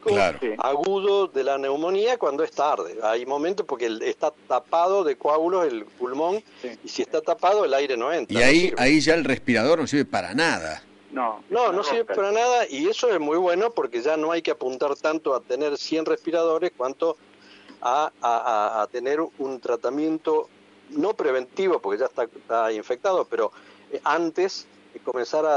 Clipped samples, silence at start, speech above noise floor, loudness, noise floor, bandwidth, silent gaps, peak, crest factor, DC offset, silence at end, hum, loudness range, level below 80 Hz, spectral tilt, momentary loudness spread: under 0.1%; 0.05 s; 26 dB; -24 LUFS; -49 dBFS; 11 kHz; none; -8 dBFS; 16 dB; under 0.1%; 0 s; none; 5 LU; -54 dBFS; -4 dB/octave; 8 LU